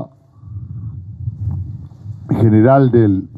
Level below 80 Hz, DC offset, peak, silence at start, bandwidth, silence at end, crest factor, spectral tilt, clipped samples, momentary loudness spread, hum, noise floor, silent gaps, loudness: -42 dBFS; under 0.1%; 0 dBFS; 0 s; 4.4 kHz; 0 s; 16 dB; -11.5 dB/octave; under 0.1%; 22 LU; none; -37 dBFS; none; -14 LUFS